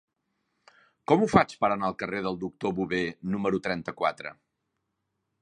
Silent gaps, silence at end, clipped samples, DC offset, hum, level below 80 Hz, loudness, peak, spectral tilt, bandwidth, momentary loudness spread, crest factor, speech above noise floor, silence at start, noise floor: none; 1.1 s; under 0.1%; under 0.1%; none; -58 dBFS; -27 LUFS; -2 dBFS; -6.5 dB/octave; 10.5 kHz; 10 LU; 26 dB; 53 dB; 1.1 s; -80 dBFS